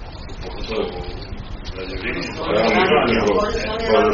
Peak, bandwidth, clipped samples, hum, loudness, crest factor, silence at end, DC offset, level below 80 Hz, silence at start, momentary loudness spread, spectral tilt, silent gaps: -2 dBFS; 7.2 kHz; under 0.1%; none; -19 LUFS; 18 dB; 0 s; under 0.1%; -34 dBFS; 0 s; 17 LU; -3 dB/octave; none